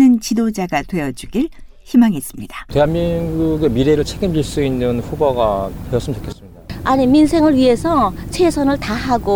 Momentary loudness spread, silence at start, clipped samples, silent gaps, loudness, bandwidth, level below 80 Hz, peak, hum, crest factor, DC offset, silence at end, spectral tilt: 12 LU; 0 s; under 0.1%; none; -16 LUFS; 19.5 kHz; -32 dBFS; -2 dBFS; none; 14 dB; under 0.1%; 0 s; -6.5 dB/octave